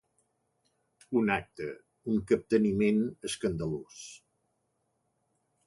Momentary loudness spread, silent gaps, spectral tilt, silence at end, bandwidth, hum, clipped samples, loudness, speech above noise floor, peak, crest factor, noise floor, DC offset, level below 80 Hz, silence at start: 16 LU; none; -6 dB/octave; 1.5 s; 11.5 kHz; none; under 0.1%; -30 LUFS; 48 dB; -14 dBFS; 20 dB; -78 dBFS; under 0.1%; -60 dBFS; 1.1 s